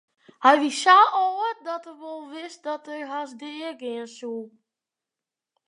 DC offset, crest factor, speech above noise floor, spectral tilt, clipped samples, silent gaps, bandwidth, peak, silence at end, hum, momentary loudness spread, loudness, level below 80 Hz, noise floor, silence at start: under 0.1%; 22 dB; 65 dB; -1.5 dB/octave; under 0.1%; none; 11 kHz; -2 dBFS; 1.2 s; none; 21 LU; -22 LUFS; -88 dBFS; -89 dBFS; 0.4 s